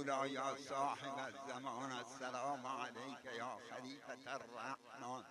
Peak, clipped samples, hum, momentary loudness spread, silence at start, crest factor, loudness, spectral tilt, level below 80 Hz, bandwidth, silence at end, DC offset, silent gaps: -26 dBFS; under 0.1%; none; 9 LU; 0 s; 18 dB; -46 LUFS; -3.5 dB/octave; under -90 dBFS; 13 kHz; 0 s; under 0.1%; none